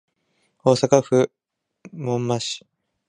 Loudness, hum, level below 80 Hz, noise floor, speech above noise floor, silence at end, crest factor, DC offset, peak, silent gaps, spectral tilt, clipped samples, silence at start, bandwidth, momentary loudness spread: -21 LUFS; none; -64 dBFS; -69 dBFS; 49 dB; 0.5 s; 22 dB; under 0.1%; 0 dBFS; none; -5.5 dB/octave; under 0.1%; 0.65 s; 11 kHz; 15 LU